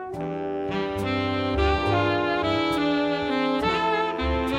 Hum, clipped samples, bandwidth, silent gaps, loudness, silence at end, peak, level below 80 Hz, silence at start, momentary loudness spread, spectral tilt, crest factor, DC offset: none; under 0.1%; 16 kHz; none; -24 LUFS; 0 s; -10 dBFS; -36 dBFS; 0 s; 6 LU; -6.5 dB/octave; 14 dB; under 0.1%